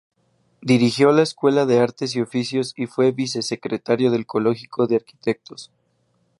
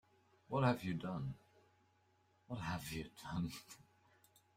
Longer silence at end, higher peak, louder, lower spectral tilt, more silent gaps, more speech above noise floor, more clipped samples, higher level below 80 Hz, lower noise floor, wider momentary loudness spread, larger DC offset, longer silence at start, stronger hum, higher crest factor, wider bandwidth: about the same, 0.75 s vs 0.75 s; first, -2 dBFS vs -22 dBFS; first, -20 LUFS vs -42 LUFS; about the same, -5.5 dB/octave vs -6.5 dB/octave; neither; first, 46 dB vs 34 dB; neither; about the same, -66 dBFS vs -68 dBFS; second, -66 dBFS vs -75 dBFS; second, 10 LU vs 18 LU; neither; about the same, 0.6 s vs 0.5 s; neither; second, 18 dB vs 24 dB; second, 11.5 kHz vs 16 kHz